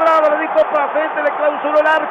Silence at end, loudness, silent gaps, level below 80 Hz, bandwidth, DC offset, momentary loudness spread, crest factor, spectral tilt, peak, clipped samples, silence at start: 0 s; -15 LUFS; none; -64 dBFS; 7.4 kHz; under 0.1%; 4 LU; 10 dB; -4 dB/octave; -4 dBFS; under 0.1%; 0 s